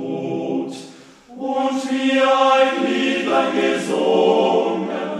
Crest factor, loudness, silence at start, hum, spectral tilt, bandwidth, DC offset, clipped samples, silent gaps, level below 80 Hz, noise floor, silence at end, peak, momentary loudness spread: 16 dB; -18 LUFS; 0 s; none; -4.5 dB/octave; 12 kHz; under 0.1%; under 0.1%; none; -68 dBFS; -42 dBFS; 0 s; -2 dBFS; 10 LU